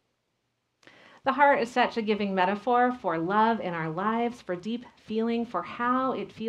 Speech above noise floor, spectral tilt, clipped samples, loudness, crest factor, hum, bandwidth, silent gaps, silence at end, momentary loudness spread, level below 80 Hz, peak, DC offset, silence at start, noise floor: 51 dB; -6.5 dB/octave; under 0.1%; -27 LUFS; 20 dB; none; 10.5 kHz; none; 0 s; 11 LU; -68 dBFS; -8 dBFS; under 0.1%; 1.25 s; -77 dBFS